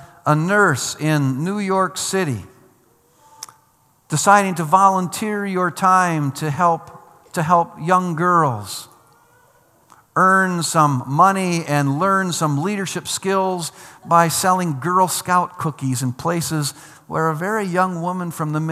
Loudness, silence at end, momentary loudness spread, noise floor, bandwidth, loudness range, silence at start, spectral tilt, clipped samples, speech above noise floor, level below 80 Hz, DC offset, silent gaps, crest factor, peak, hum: -18 LUFS; 0 s; 10 LU; -58 dBFS; 15 kHz; 4 LU; 0 s; -5 dB/octave; under 0.1%; 40 dB; -66 dBFS; under 0.1%; none; 20 dB; 0 dBFS; none